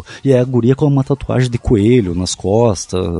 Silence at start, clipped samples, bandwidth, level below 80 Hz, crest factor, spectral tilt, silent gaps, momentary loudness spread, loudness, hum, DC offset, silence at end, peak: 0 s; under 0.1%; 11.5 kHz; -32 dBFS; 14 dB; -6.5 dB/octave; none; 6 LU; -14 LUFS; none; under 0.1%; 0 s; 0 dBFS